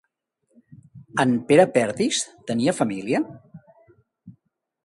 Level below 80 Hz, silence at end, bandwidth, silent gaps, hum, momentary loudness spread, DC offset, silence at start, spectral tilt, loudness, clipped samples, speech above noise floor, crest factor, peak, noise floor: -64 dBFS; 0.55 s; 11.5 kHz; none; none; 10 LU; under 0.1%; 0.95 s; -4.5 dB/octave; -22 LUFS; under 0.1%; 52 dB; 22 dB; -2 dBFS; -73 dBFS